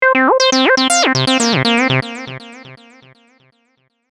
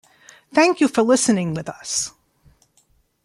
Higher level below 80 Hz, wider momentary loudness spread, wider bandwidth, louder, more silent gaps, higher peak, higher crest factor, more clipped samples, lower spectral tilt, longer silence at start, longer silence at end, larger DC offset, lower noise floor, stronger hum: about the same, -58 dBFS vs -60 dBFS; first, 16 LU vs 11 LU; about the same, 14 kHz vs 13 kHz; first, -12 LUFS vs -19 LUFS; neither; first, 0 dBFS vs -4 dBFS; about the same, 14 dB vs 16 dB; neither; about the same, -3 dB/octave vs -4 dB/octave; second, 0 s vs 0.55 s; first, 1.35 s vs 1.15 s; neither; about the same, -62 dBFS vs -61 dBFS; neither